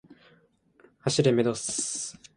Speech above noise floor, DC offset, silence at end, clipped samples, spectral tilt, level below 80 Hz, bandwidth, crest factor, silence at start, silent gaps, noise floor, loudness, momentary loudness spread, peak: 37 dB; under 0.1%; 0.25 s; under 0.1%; -4.5 dB/octave; -64 dBFS; 11.5 kHz; 20 dB; 0.1 s; none; -63 dBFS; -27 LUFS; 10 LU; -8 dBFS